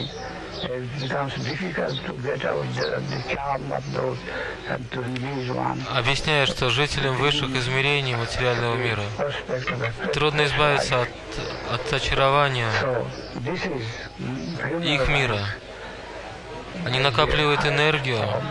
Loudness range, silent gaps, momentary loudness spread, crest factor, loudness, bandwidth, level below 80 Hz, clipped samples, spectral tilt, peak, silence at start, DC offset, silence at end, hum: 5 LU; none; 12 LU; 22 dB; -24 LUFS; 12 kHz; -42 dBFS; under 0.1%; -5 dB/octave; -2 dBFS; 0 s; under 0.1%; 0 s; none